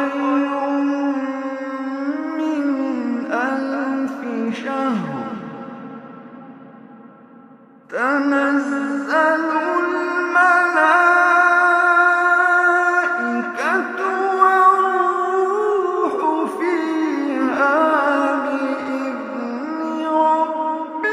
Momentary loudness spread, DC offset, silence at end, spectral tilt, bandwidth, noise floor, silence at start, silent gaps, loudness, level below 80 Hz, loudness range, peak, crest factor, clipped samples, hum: 12 LU; under 0.1%; 0 s; -5 dB/octave; 11.5 kHz; -46 dBFS; 0 s; none; -18 LUFS; -76 dBFS; 11 LU; 0 dBFS; 18 dB; under 0.1%; none